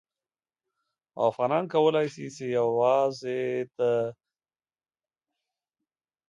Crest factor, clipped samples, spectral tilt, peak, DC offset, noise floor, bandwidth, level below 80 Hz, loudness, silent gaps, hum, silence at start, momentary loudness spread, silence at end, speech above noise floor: 18 dB; under 0.1%; -6 dB/octave; -10 dBFS; under 0.1%; under -90 dBFS; 7.8 kHz; -78 dBFS; -27 LUFS; none; none; 1.15 s; 8 LU; 2.15 s; over 64 dB